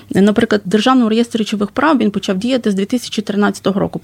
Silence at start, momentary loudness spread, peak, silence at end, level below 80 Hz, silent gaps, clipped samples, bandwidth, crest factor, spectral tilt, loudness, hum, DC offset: 0.1 s; 6 LU; -2 dBFS; 0.05 s; -50 dBFS; none; under 0.1%; 15.5 kHz; 12 dB; -5.5 dB/octave; -15 LUFS; none; under 0.1%